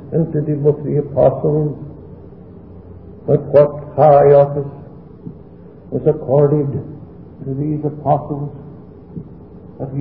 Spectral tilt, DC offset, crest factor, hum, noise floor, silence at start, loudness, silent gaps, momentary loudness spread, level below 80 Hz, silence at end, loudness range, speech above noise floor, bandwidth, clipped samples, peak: -13.5 dB/octave; 0.3%; 16 dB; none; -39 dBFS; 0 s; -15 LUFS; none; 25 LU; -44 dBFS; 0 s; 6 LU; 24 dB; 4.3 kHz; under 0.1%; 0 dBFS